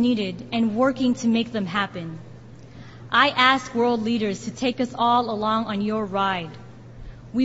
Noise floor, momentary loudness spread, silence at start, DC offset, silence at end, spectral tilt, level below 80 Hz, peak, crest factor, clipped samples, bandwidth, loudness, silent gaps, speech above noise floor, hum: -43 dBFS; 19 LU; 0 s; under 0.1%; 0 s; -5 dB/octave; -52 dBFS; -2 dBFS; 20 dB; under 0.1%; 8 kHz; -22 LUFS; none; 20 dB; none